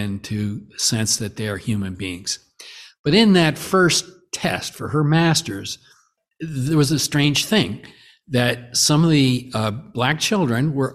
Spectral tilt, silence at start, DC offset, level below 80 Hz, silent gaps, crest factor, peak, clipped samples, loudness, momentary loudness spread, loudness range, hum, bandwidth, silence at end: -4.5 dB/octave; 0 s; under 0.1%; -52 dBFS; 2.99-3.04 s; 18 dB; -2 dBFS; under 0.1%; -19 LUFS; 14 LU; 3 LU; none; 15 kHz; 0 s